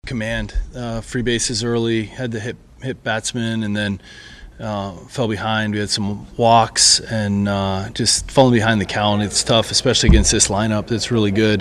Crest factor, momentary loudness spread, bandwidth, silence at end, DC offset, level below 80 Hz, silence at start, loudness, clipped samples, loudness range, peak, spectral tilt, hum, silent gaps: 18 dB; 14 LU; 13 kHz; 0 s; under 0.1%; -30 dBFS; 0.05 s; -17 LUFS; under 0.1%; 8 LU; 0 dBFS; -3.5 dB/octave; none; none